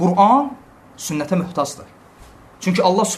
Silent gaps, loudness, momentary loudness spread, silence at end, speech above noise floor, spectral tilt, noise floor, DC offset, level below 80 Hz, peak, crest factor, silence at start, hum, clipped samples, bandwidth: none; -18 LUFS; 14 LU; 0 s; 27 dB; -5 dB/octave; -44 dBFS; under 0.1%; -54 dBFS; 0 dBFS; 18 dB; 0 s; none; under 0.1%; 13.5 kHz